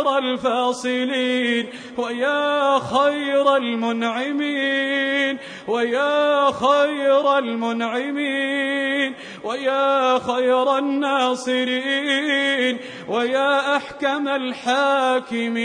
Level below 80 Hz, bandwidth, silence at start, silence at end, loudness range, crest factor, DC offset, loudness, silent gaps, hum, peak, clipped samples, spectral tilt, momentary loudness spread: -68 dBFS; 10 kHz; 0 s; 0 s; 1 LU; 16 dB; under 0.1%; -20 LUFS; none; none; -4 dBFS; under 0.1%; -3.5 dB/octave; 6 LU